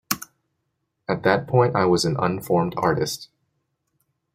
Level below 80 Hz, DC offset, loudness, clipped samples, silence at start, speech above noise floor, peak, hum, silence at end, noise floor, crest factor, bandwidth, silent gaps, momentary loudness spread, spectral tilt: -56 dBFS; under 0.1%; -22 LUFS; under 0.1%; 0.1 s; 55 dB; -2 dBFS; none; 1.1 s; -76 dBFS; 22 dB; 16.5 kHz; none; 9 LU; -5.5 dB/octave